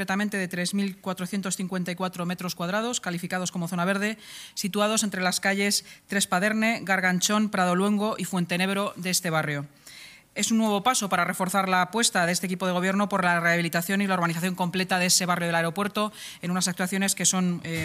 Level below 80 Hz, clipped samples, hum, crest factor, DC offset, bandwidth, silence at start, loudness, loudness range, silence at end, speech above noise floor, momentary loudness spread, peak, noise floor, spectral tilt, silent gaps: -68 dBFS; under 0.1%; none; 18 dB; under 0.1%; 15.5 kHz; 0 s; -25 LUFS; 5 LU; 0 s; 22 dB; 8 LU; -8 dBFS; -47 dBFS; -3.5 dB/octave; none